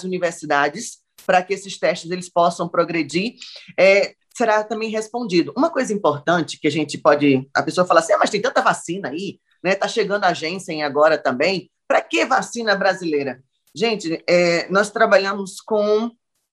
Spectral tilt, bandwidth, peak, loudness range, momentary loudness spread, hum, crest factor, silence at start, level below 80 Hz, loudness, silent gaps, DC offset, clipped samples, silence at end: -4.5 dB/octave; 12.5 kHz; 0 dBFS; 2 LU; 11 LU; none; 18 dB; 0 s; -70 dBFS; -19 LUFS; none; under 0.1%; under 0.1%; 0.4 s